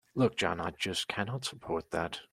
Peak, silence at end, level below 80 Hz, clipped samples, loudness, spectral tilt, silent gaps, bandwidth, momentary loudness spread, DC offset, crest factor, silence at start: -14 dBFS; 0.05 s; -62 dBFS; under 0.1%; -33 LUFS; -4.5 dB/octave; none; 15 kHz; 7 LU; under 0.1%; 20 dB; 0.15 s